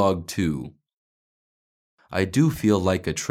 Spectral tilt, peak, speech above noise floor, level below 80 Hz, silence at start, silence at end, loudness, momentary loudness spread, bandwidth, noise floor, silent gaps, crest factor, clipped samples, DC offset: -6 dB/octave; -6 dBFS; over 68 dB; -50 dBFS; 0 s; 0 s; -23 LUFS; 11 LU; 16 kHz; under -90 dBFS; 0.93-1.98 s; 18 dB; under 0.1%; under 0.1%